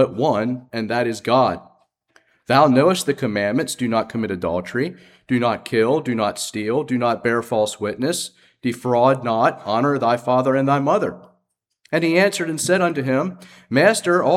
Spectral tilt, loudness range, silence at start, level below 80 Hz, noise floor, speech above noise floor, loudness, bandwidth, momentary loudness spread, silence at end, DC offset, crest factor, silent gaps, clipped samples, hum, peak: -5 dB/octave; 2 LU; 0 s; -60 dBFS; -71 dBFS; 52 dB; -20 LUFS; 16 kHz; 9 LU; 0 s; under 0.1%; 18 dB; none; under 0.1%; none; 0 dBFS